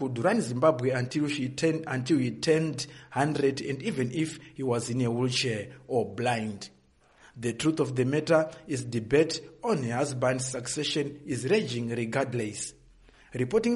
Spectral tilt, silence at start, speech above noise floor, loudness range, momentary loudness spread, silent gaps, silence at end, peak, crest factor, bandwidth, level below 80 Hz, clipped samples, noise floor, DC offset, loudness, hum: -5 dB/octave; 0 s; 32 dB; 3 LU; 9 LU; none; 0 s; -10 dBFS; 20 dB; 11.5 kHz; -62 dBFS; under 0.1%; -60 dBFS; under 0.1%; -29 LUFS; none